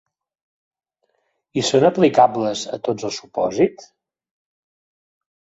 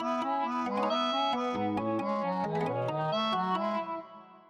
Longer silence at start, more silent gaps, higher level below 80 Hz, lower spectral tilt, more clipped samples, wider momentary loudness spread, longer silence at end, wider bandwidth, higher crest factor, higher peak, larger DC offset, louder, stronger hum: first, 1.55 s vs 0 s; neither; first, -62 dBFS vs -70 dBFS; about the same, -5 dB/octave vs -6 dB/octave; neither; first, 11 LU vs 4 LU; first, 1.75 s vs 0.1 s; second, 8 kHz vs 11 kHz; first, 20 dB vs 12 dB; first, -2 dBFS vs -18 dBFS; neither; first, -19 LUFS vs -31 LUFS; neither